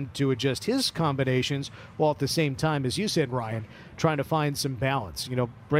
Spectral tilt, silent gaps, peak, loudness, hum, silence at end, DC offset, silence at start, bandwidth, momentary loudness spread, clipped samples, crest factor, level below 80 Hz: -5 dB/octave; none; -8 dBFS; -27 LUFS; none; 0 s; under 0.1%; 0 s; 16 kHz; 6 LU; under 0.1%; 18 dB; -54 dBFS